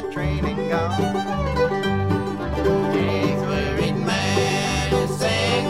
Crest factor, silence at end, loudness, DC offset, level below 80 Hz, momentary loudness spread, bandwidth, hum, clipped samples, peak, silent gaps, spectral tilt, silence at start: 14 dB; 0 s; -22 LUFS; 0.5%; -34 dBFS; 4 LU; 15.5 kHz; none; under 0.1%; -8 dBFS; none; -5.5 dB/octave; 0 s